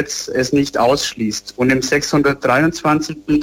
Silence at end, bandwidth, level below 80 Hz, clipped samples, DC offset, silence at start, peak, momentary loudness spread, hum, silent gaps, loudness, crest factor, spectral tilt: 0 s; 16.5 kHz; -44 dBFS; under 0.1%; under 0.1%; 0 s; -4 dBFS; 5 LU; none; none; -16 LUFS; 14 dB; -4.5 dB/octave